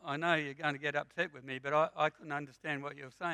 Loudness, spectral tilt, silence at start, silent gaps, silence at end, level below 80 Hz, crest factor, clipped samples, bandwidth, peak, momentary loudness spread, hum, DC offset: -35 LUFS; -5.5 dB/octave; 0.05 s; none; 0 s; -80 dBFS; 22 dB; under 0.1%; 10 kHz; -14 dBFS; 9 LU; none; under 0.1%